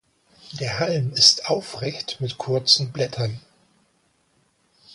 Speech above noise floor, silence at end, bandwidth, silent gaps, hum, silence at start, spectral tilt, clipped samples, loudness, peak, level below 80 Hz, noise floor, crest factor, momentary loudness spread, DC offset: 43 dB; 0 s; 11.5 kHz; none; none; 0.45 s; -3 dB/octave; under 0.1%; -20 LUFS; 0 dBFS; -60 dBFS; -65 dBFS; 24 dB; 15 LU; under 0.1%